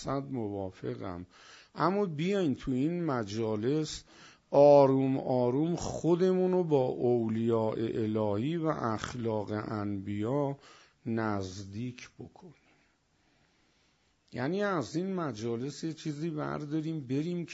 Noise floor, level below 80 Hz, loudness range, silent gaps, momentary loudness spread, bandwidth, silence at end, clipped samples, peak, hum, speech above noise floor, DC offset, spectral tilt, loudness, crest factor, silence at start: -71 dBFS; -62 dBFS; 12 LU; none; 13 LU; 8 kHz; 0 s; under 0.1%; -10 dBFS; none; 40 dB; under 0.1%; -7 dB/octave; -31 LUFS; 20 dB; 0 s